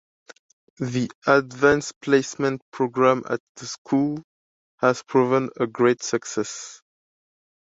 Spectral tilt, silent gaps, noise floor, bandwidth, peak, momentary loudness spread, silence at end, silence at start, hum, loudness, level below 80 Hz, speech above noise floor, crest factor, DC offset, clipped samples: -5 dB/octave; 1.15-1.22 s, 1.96-2.01 s, 2.62-2.72 s, 3.40-3.55 s, 3.78-3.85 s, 4.24-4.78 s; under -90 dBFS; 8 kHz; -2 dBFS; 12 LU; 0.9 s; 0.8 s; none; -23 LUFS; -60 dBFS; over 68 dB; 22 dB; under 0.1%; under 0.1%